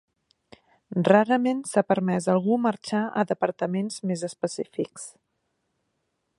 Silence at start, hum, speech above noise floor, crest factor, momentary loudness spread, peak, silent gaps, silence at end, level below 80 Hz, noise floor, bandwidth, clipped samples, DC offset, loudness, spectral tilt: 0.9 s; none; 52 dB; 22 dB; 12 LU; -4 dBFS; none; 1.3 s; -74 dBFS; -76 dBFS; 11.5 kHz; under 0.1%; under 0.1%; -25 LUFS; -6 dB/octave